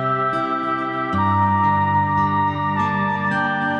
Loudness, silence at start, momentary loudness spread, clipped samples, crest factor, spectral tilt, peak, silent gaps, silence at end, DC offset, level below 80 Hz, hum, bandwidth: -19 LUFS; 0 s; 4 LU; under 0.1%; 12 dB; -8 dB/octave; -6 dBFS; none; 0 s; under 0.1%; -54 dBFS; none; 7.8 kHz